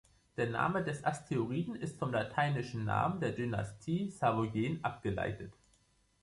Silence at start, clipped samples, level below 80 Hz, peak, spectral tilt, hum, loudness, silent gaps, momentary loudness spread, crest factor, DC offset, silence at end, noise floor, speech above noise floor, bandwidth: 0.35 s; under 0.1%; -60 dBFS; -16 dBFS; -7 dB/octave; none; -36 LUFS; none; 6 LU; 18 dB; under 0.1%; 0.7 s; -71 dBFS; 36 dB; 11.5 kHz